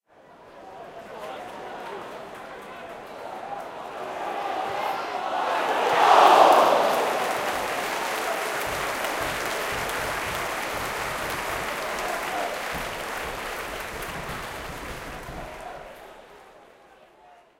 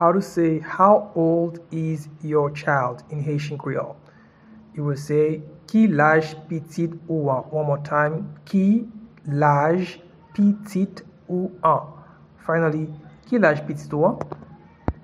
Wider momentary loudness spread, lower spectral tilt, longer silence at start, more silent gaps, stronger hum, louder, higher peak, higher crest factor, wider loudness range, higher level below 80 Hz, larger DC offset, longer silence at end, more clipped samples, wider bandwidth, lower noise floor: first, 19 LU vs 14 LU; second, -2.5 dB/octave vs -8 dB/octave; first, 0.3 s vs 0 s; neither; neither; second, -25 LUFS vs -22 LUFS; about the same, -4 dBFS vs -2 dBFS; about the same, 24 dB vs 20 dB; first, 17 LU vs 4 LU; about the same, -50 dBFS vs -52 dBFS; neither; first, 0.25 s vs 0.1 s; neither; first, 17 kHz vs 12 kHz; first, -54 dBFS vs -49 dBFS